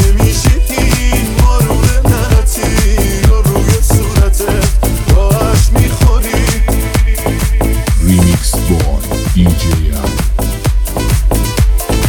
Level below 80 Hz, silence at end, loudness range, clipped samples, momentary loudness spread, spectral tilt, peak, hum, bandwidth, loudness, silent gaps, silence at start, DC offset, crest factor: -12 dBFS; 0 s; 2 LU; under 0.1%; 4 LU; -5 dB/octave; 0 dBFS; none; 19.5 kHz; -12 LUFS; none; 0 s; 0.4%; 10 dB